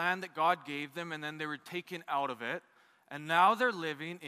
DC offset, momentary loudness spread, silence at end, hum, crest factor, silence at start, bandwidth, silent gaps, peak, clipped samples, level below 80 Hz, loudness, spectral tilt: under 0.1%; 14 LU; 0 s; none; 20 dB; 0 s; 15.5 kHz; none; -14 dBFS; under 0.1%; -88 dBFS; -33 LUFS; -4.5 dB/octave